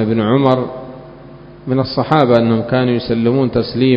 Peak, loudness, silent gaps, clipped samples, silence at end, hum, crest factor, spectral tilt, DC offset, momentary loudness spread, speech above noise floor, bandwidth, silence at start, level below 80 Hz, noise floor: 0 dBFS; -15 LUFS; none; under 0.1%; 0 s; none; 14 dB; -9.5 dB/octave; under 0.1%; 18 LU; 23 dB; 5.4 kHz; 0 s; -44 dBFS; -36 dBFS